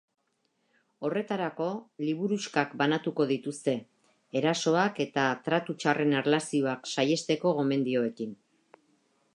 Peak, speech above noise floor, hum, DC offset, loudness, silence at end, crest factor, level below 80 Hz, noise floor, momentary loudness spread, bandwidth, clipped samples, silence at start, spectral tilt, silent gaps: -8 dBFS; 47 dB; none; under 0.1%; -29 LUFS; 1 s; 22 dB; -80 dBFS; -75 dBFS; 8 LU; 11 kHz; under 0.1%; 1 s; -5 dB/octave; none